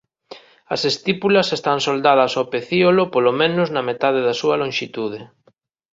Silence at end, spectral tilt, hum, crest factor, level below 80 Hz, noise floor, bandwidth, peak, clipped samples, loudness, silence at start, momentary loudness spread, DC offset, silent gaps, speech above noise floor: 0.65 s; -5 dB/octave; none; 18 dB; -62 dBFS; -60 dBFS; 7.8 kHz; -2 dBFS; under 0.1%; -18 LUFS; 0.3 s; 9 LU; under 0.1%; none; 42 dB